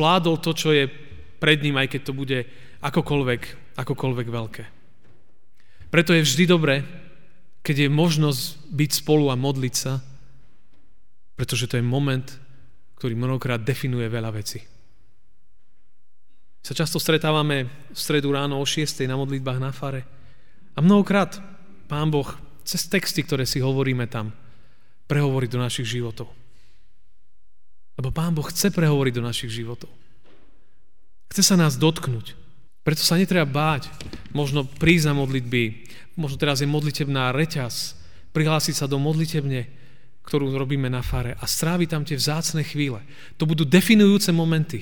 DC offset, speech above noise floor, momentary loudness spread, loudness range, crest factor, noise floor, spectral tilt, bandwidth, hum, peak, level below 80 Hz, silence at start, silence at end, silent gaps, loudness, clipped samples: 2%; 50 dB; 14 LU; 7 LU; 20 dB; -72 dBFS; -5 dB/octave; 19.5 kHz; none; -4 dBFS; -48 dBFS; 0 s; 0 s; none; -22 LUFS; under 0.1%